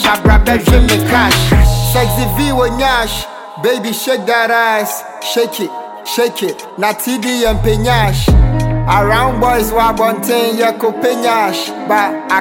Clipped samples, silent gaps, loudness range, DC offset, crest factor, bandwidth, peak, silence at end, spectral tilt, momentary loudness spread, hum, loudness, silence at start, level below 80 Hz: under 0.1%; none; 4 LU; under 0.1%; 12 dB; 17 kHz; 0 dBFS; 0 s; -5 dB/octave; 8 LU; none; -13 LUFS; 0 s; -18 dBFS